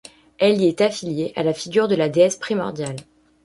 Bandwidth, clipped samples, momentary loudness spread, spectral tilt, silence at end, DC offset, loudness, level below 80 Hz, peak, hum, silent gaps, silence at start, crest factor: 11.5 kHz; under 0.1%; 10 LU; -5 dB/octave; 0.4 s; under 0.1%; -20 LUFS; -60 dBFS; -4 dBFS; none; none; 0.4 s; 16 dB